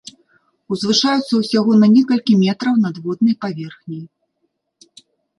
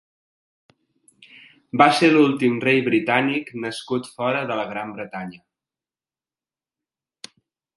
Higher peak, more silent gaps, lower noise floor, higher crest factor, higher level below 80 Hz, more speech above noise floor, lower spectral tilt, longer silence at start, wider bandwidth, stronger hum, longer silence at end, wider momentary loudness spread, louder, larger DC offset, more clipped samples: about the same, -2 dBFS vs 0 dBFS; neither; second, -70 dBFS vs under -90 dBFS; second, 14 dB vs 22 dB; first, -64 dBFS vs -70 dBFS; second, 55 dB vs over 70 dB; about the same, -5.5 dB/octave vs -5.5 dB/octave; second, 0.7 s vs 1.75 s; about the same, 11.5 kHz vs 11.5 kHz; neither; second, 1.3 s vs 2.45 s; about the same, 18 LU vs 16 LU; first, -16 LUFS vs -20 LUFS; neither; neither